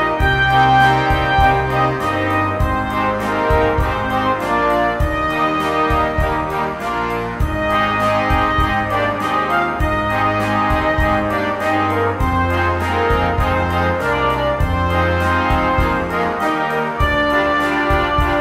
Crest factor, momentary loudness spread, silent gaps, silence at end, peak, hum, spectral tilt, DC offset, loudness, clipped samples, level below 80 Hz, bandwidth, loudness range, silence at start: 16 dB; 4 LU; none; 0 s; -2 dBFS; none; -6.5 dB/octave; under 0.1%; -17 LUFS; under 0.1%; -26 dBFS; 16 kHz; 2 LU; 0 s